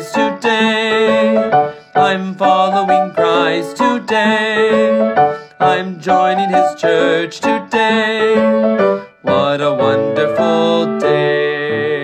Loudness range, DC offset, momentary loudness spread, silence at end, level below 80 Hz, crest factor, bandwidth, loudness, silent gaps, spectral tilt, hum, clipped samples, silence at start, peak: 1 LU; under 0.1%; 4 LU; 0 s; -62 dBFS; 14 dB; 12.5 kHz; -14 LUFS; none; -5.5 dB/octave; none; under 0.1%; 0 s; 0 dBFS